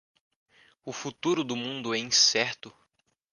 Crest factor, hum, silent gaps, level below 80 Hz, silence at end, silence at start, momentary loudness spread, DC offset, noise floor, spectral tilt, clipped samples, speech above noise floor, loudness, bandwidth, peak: 22 dB; none; none; -74 dBFS; 0.65 s; 0.85 s; 20 LU; under 0.1%; -73 dBFS; -1.5 dB/octave; under 0.1%; 45 dB; -26 LUFS; 11 kHz; -8 dBFS